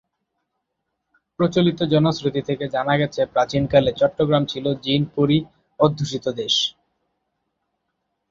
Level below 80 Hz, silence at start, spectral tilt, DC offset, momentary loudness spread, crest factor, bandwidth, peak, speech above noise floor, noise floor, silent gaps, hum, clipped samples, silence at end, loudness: -52 dBFS; 1.4 s; -6 dB/octave; under 0.1%; 7 LU; 22 dB; 7.6 kHz; 0 dBFS; 58 dB; -77 dBFS; none; none; under 0.1%; 1.6 s; -20 LUFS